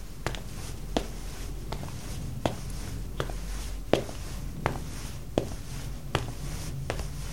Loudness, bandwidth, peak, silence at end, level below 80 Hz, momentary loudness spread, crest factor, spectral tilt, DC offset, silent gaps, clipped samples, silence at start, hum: -35 LUFS; 17 kHz; -4 dBFS; 0 s; -38 dBFS; 8 LU; 30 dB; -5 dB/octave; 0.9%; none; under 0.1%; 0 s; none